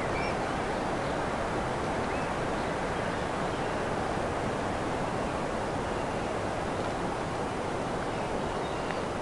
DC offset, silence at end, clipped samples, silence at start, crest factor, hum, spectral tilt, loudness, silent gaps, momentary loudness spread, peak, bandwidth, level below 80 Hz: under 0.1%; 0 s; under 0.1%; 0 s; 18 dB; none; -5.5 dB/octave; -32 LUFS; none; 1 LU; -14 dBFS; 11.5 kHz; -46 dBFS